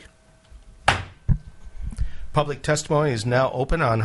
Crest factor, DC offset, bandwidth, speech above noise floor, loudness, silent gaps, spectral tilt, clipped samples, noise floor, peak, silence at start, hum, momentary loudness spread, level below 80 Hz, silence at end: 22 dB; under 0.1%; 11.5 kHz; 30 dB; -24 LUFS; none; -5 dB/octave; under 0.1%; -52 dBFS; 0 dBFS; 0.55 s; none; 11 LU; -34 dBFS; 0 s